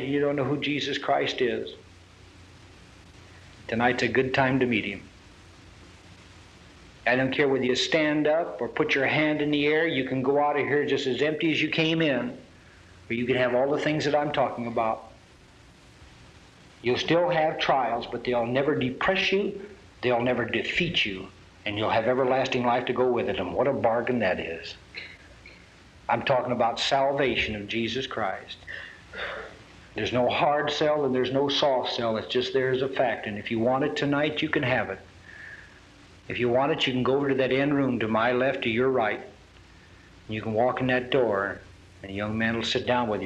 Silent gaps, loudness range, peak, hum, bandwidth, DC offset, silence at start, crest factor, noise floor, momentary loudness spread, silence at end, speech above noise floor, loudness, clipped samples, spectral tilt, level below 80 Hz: none; 5 LU; -8 dBFS; none; 9.2 kHz; under 0.1%; 0 s; 18 dB; -53 dBFS; 13 LU; 0 s; 28 dB; -25 LUFS; under 0.1%; -5.5 dB/octave; -56 dBFS